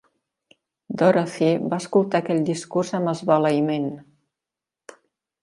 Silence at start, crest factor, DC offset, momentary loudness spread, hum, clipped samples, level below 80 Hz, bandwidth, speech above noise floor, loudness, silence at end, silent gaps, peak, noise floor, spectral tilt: 0.9 s; 20 dB; under 0.1%; 8 LU; none; under 0.1%; -70 dBFS; 11.5 kHz; 67 dB; -22 LUFS; 1.4 s; none; -2 dBFS; -88 dBFS; -6.5 dB/octave